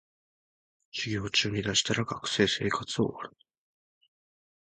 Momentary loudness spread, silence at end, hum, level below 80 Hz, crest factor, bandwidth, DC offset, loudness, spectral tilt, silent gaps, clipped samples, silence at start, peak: 11 LU; 1.4 s; none; -58 dBFS; 22 dB; 9.6 kHz; under 0.1%; -28 LUFS; -3.5 dB/octave; none; under 0.1%; 0.95 s; -10 dBFS